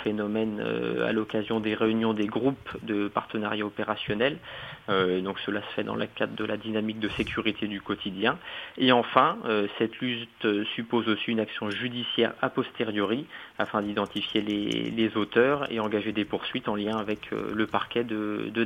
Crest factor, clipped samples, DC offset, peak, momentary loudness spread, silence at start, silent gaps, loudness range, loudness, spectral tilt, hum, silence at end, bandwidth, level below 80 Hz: 26 dB; under 0.1%; under 0.1%; -2 dBFS; 7 LU; 0 s; none; 3 LU; -28 LUFS; -6.5 dB/octave; none; 0 s; 10.5 kHz; -60 dBFS